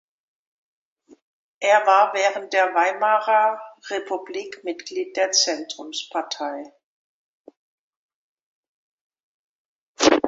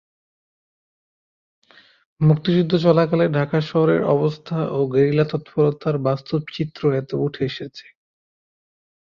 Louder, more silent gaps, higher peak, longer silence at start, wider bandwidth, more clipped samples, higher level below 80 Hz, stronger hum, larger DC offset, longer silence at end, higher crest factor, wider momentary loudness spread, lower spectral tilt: about the same, -21 LUFS vs -20 LUFS; first, 6.84-7.45 s, 7.57-9.10 s, 9.20-9.95 s vs none; first, 0 dBFS vs -4 dBFS; second, 1.6 s vs 2.2 s; first, 8 kHz vs 6.8 kHz; neither; second, -66 dBFS vs -58 dBFS; neither; neither; second, 0 s vs 1.2 s; first, 24 dB vs 18 dB; first, 14 LU vs 9 LU; second, -1 dB/octave vs -9 dB/octave